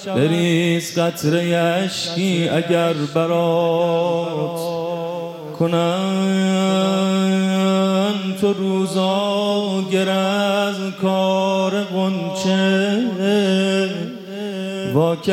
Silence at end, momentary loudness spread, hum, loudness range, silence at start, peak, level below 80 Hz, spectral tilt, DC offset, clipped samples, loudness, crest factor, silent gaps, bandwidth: 0 s; 7 LU; none; 2 LU; 0 s; -4 dBFS; -66 dBFS; -5.5 dB/octave; under 0.1%; under 0.1%; -19 LUFS; 14 dB; none; 15.5 kHz